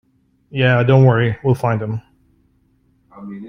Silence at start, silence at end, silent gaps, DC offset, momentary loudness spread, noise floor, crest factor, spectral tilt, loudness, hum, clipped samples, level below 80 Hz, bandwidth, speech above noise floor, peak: 0.55 s; 0 s; none; under 0.1%; 18 LU; -59 dBFS; 16 dB; -8.5 dB/octave; -15 LUFS; none; under 0.1%; -50 dBFS; 6 kHz; 44 dB; -2 dBFS